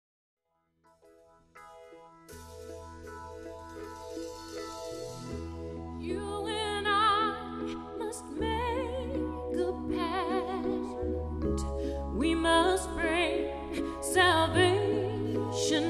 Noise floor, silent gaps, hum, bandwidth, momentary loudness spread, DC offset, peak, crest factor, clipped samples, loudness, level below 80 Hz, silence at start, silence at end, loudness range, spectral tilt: -73 dBFS; none; none; 14 kHz; 19 LU; under 0.1%; -12 dBFS; 20 dB; under 0.1%; -31 LUFS; -46 dBFS; 1.55 s; 0 s; 18 LU; -4.5 dB/octave